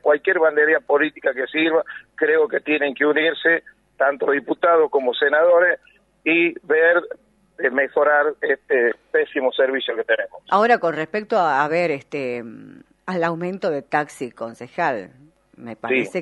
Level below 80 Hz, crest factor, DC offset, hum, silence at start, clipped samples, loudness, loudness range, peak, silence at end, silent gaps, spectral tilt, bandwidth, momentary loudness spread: -68 dBFS; 18 dB; under 0.1%; none; 0.05 s; under 0.1%; -19 LUFS; 7 LU; -2 dBFS; 0 s; none; -5.5 dB/octave; 11.5 kHz; 12 LU